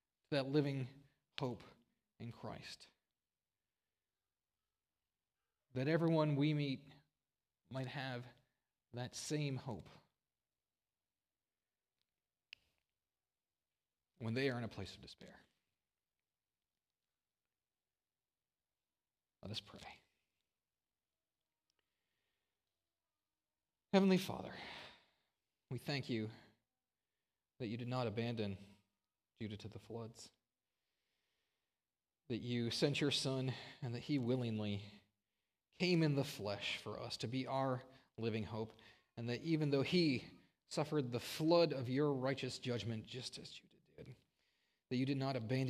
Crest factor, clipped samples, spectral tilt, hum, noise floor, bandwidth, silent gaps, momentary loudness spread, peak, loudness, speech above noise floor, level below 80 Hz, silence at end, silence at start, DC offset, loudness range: 24 dB; under 0.1%; -6 dB/octave; none; under -90 dBFS; 15.5 kHz; none; 20 LU; -20 dBFS; -41 LUFS; over 50 dB; -80 dBFS; 0 s; 0.3 s; under 0.1%; 17 LU